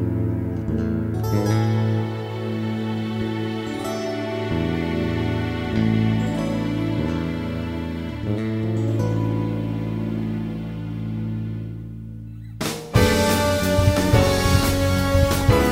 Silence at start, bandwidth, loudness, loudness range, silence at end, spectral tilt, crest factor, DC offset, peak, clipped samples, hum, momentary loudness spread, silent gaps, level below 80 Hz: 0 s; 16 kHz; -23 LUFS; 6 LU; 0 s; -6 dB/octave; 18 dB; under 0.1%; -4 dBFS; under 0.1%; none; 11 LU; none; -34 dBFS